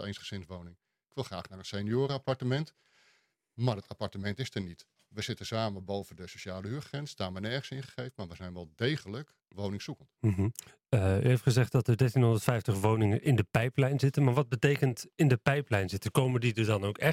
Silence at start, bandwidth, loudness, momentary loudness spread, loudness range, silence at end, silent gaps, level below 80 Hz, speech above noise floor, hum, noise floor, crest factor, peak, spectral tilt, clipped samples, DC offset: 0 s; 16 kHz; -31 LUFS; 16 LU; 10 LU; 0 s; none; -64 dBFS; 41 dB; none; -71 dBFS; 24 dB; -6 dBFS; -6.5 dB/octave; under 0.1%; under 0.1%